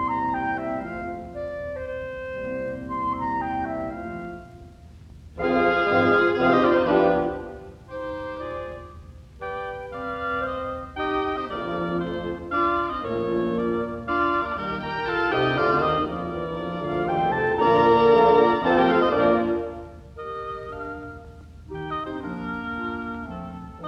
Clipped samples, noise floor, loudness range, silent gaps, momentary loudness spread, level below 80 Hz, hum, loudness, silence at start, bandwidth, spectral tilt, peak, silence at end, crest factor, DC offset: under 0.1%; -45 dBFS; 12 LU; none; 16 LU; -48 dBFS; none; -24 LUFS; 0 s; 7.6 kHz; -7.5 dB/octave; -6 dBFS; 0 s; 18 dB; under 0.1%